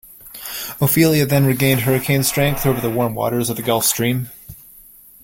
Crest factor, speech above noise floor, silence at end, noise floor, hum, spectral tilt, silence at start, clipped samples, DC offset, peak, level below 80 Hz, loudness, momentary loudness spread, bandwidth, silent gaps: 16 dB; 28 dB; 0.7 s; -45 dBFS; none; -5 dB/octave; 0.1 s; under 0.1%; under 0.1%; -2 dBFS; -44 dBFS; -17 LUFS; 14 LU; 17 kHz; none